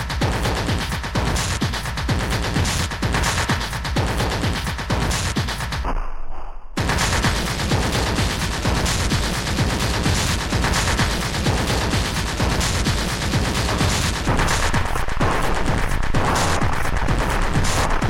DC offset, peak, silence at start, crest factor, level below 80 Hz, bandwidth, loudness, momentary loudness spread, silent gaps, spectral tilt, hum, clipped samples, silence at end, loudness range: under 0.1%; -6 dBFS; 0 s; 14 dB; -26 dBFS; 16.5 kHz; -21 LUFS; 4 LU; none; -4 dB/octave; none; under 0.1%; 0 s; 2 LU